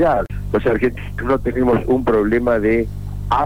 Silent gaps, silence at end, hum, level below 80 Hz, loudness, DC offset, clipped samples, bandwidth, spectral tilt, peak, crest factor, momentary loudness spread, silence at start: none; 0 s; 50 Hz at -30 dBFS; -30 dBFS; -18 LUFS; 2%; under 0.1%; 19.5 kHz; -8.5 dB/octave; -8 dBFS; 10 dB; 6 LU; 0 s